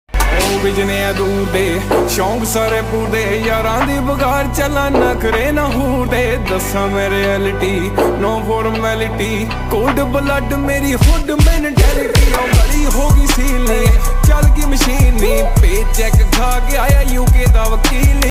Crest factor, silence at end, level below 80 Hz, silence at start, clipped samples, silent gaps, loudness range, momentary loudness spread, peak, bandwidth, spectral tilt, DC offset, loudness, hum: 12 dB; 0 s; -14 dBFS; 0.15 s; under 0.1%; none; 3 LU; 4 LU; 0 dBFS; 16.5 kHz; -5 dB/octave; under 0.1%; -14 LUFS; none